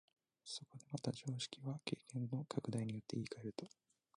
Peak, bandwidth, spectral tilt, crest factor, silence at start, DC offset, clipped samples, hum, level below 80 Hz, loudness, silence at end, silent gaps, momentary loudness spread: -24 dBFS; 11 kHz; -5.5 dB/octave; 22 dB; 0.45 s; under 0.1%; under 0.1%; none; -80 dBFS; -46 LUFS; 0.5 s; none; 7 LU